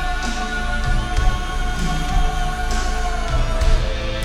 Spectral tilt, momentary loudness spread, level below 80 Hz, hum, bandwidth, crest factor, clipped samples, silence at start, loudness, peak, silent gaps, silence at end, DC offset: -4.5 dB/octave; 3 LU; -20 dBFS; none; 12.5 kHz; 14 dB; under 0.1%; 0 s; -23 LUFS; -4 dBFS; none; 0 s; under 0.1%